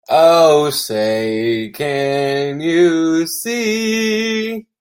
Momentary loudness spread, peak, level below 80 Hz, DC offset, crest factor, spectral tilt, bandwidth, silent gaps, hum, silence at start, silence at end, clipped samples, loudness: 9 LU; 0 dBFS; -60 dBFS; under 0.1%; 14 dB; -4 dB/octave; 16.5 kHz; none; none; 0.1 s; 0.2 s; under 0.1%; -15 LUFS